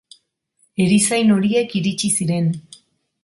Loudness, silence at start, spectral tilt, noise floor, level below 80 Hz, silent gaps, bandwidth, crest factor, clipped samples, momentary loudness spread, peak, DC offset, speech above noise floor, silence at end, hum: -18 LUFS; 0.8 s; -4.5 dB/octave; -64 dBFS; -58 dBFS; none; 11.5 kHz; 14 dB; under 0.1%; 8 LU; -6 dBFS; under 0.1%; 47 dB; 0.65 s; none